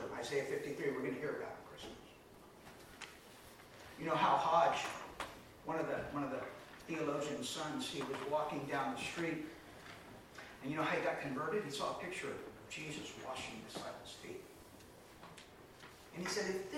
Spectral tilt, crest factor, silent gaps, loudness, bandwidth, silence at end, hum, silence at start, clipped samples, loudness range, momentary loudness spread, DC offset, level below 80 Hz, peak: -4 dB/octave; 22 dB; none; -40 LUFS; 17 kHz; 0 s; none; 0 s; under 0.1%; 10 LU; 20 LU; under 0.1%; -70 dBFS; -18 dBFS